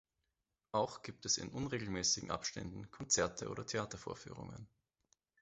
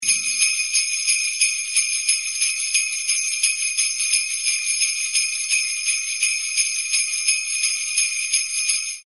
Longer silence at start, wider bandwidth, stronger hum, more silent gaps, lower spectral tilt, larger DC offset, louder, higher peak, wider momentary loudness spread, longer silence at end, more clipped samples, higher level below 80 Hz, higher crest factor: first, 0.75 s vs 0 s; second, 8 kHz vs 12 kHz; neither; neither; first, -3 dB/octave vs 6.5 dB/octave; second, under 0.1% vs 0.1%; second, -39 LUFS vs -19 LUFS; second, -20 dBFS vs -2 dBFS; first, 15 LU vs 2 LU; first, 0.75 s vs 0.05 s; neither; first, -64 dBFS vs -78 dBFS; about the same, 22 dB vs 20 dB